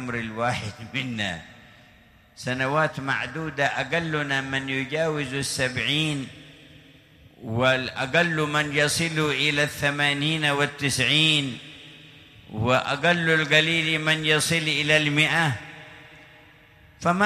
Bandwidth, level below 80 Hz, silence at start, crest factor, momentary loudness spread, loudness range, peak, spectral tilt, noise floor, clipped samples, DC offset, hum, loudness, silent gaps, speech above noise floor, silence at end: 15 kHz; -56 dBFS; 0 s; 20 dB; 13 LU; 6 LU; -6 dBFS; -4 dB/octave; -54 dBFS; under 0.1%; under 0.1%; none; -23 LUFS; none; 30 dB; 0 s